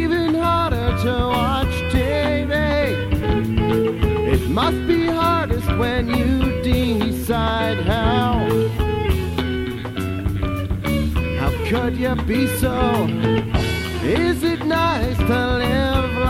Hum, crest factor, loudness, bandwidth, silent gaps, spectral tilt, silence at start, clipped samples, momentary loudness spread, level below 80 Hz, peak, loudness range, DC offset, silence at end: none; 14 dB; -20 LUFS; 16.5 kHz; none; -6.5 dB/octave; 0 s; under 0.1%; 4 LU; -28 dBFS; -4 dBFS; 3 LU; under 0.1%; 0 s